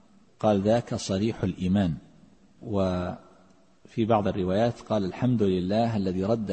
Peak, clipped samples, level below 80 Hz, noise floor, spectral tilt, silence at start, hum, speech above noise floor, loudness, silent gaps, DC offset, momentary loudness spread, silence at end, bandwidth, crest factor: -10 dBFS; under 0.1%; -54 dBFS; -59 dBFS; -7 dB/octave; 0.4 s; none; 34 dB; -26 LUFS; none; under 0.1%; 8 LU; 0 s; 8.8 kHz; 18 dB